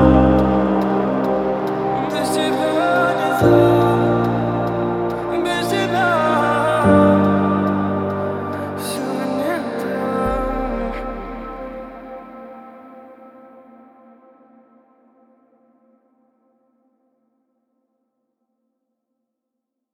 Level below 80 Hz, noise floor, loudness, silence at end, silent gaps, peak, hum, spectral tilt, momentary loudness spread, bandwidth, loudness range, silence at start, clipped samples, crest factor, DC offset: -36 dBFS; -79 dBFS; -18 LUFS; 6.65 s; none; 0 dBFS; none; -6.5 dB/octave; 18 LU; 16 kHz; 14 LU; 0 s; under 0.1%; 20 dB; under 0.1%